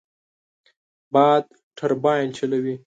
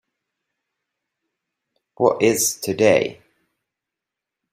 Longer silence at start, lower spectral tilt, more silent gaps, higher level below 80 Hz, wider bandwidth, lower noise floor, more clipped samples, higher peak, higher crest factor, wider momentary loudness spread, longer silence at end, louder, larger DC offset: second, 1.15 s vs 2 s; first, -6.5 dB/octave vs -3.5 dB/octave; first, 1.63-1.71 s vs none; second, -74 dBFS vs -64 dBFS; second, 9 kHz vs 16 kHz; first, under -90 dBFS vs -85 dBFS; neither; about the same, -4 dBFS vs -2 dBFS; about the same, 20 dB vs 22 dB; first, 10 LU vs 4 LU; second, 0.1 s vs 1.4 s; about the same, -21 LUFS vs -19 LUFS; neither